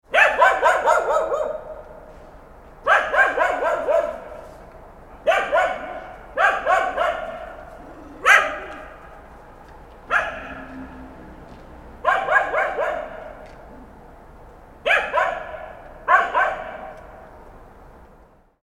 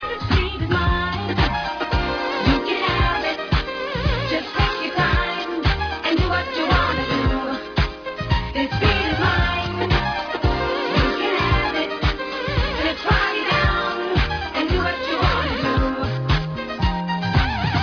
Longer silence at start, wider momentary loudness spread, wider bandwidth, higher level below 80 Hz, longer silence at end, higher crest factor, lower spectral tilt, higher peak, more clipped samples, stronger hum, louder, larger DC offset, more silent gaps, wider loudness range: about the same, 0.1 s vs 0 s; first, 24 LU vs 5 LU; first, 15 kHz vs 5.4 kHz; second, -48 dBFS vs -28 dBFS; first, 0.75 s vs 0 s; first, 22 dB vs 16 dB; second, -2.5 dB/octave vs -6.5 dB/octave; first, 0 dBFS vs -4 dBFS; neither; neither; about the same, -20 LUFS vs -21 LUFS; neither; neither; first, 5 LU vs 1 LU